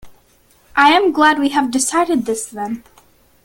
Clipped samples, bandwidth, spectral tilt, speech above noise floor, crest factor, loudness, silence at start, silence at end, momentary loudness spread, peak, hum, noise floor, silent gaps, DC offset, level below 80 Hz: under 0.1%; 17 kHz; -2 dB/octave; 38 dB; 16 dB; -15 LUFS; 0.05 s; 0.65 s; 14 LU; 0 dBFS; none; -53 dBFS; none; under 0.1%; -54 dBFS